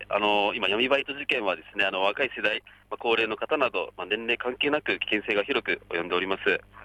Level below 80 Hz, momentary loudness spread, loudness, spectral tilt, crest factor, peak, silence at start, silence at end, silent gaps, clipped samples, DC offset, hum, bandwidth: -62 dBFS; 6 LU; -26 LUFS; -4.5 dB/octave; 16 dB; -10 dBFS; 0 s; 0 s; none; under 0.1%; under 0.1%; none; 11.5 kHz